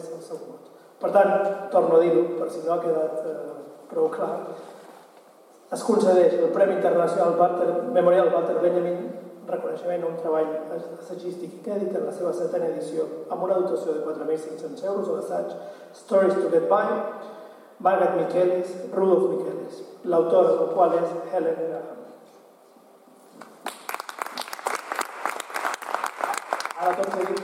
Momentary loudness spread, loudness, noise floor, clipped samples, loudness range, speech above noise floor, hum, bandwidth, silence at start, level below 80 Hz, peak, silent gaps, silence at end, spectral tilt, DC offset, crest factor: 16 LU; -24 LUFS; -53 dBFS; under 0.1%; 9 LU; 30 dB; none; 16.5 kHz; 0 s; -86 dBFS; -4 dBFS; none; 0 s; -5.5 dB/octave; under 0.1%; 20 dB